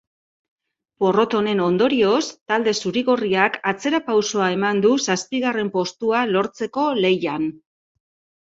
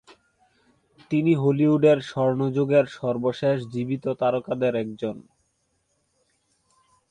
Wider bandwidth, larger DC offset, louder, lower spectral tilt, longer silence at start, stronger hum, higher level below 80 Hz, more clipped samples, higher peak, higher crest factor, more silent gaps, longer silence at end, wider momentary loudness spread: second, 8 kHz vs 9.6 kHz; neither; first, -20 LUFS vs -23 LUFS; second, -4.5 dB/octave vs -8.5 dB/octave; about the same, 1 s vs 1.1 s; neither; about the same, -64 dBFS vs -66 dBFS; neither; first, -2 dBFS vs -8 dBFS; about the same, 18 dB vs 18 dB; first, 2.41-2.46 s vs none; second, 0.9 s vs 1.9 s; second, 5 LU vs 9 LU